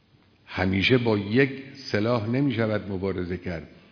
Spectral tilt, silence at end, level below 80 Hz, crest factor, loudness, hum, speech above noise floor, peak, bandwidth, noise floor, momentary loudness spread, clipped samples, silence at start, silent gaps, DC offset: -7.5 dB/octave; 0.25 s; -56 dBFS; 20 dB; -25 LUFS; none; 32 dB; -6 dBFS; 5.4 kHz; -57 dBFS; 14 LU; under 0.1%; 0.5 s; none; under 0.1%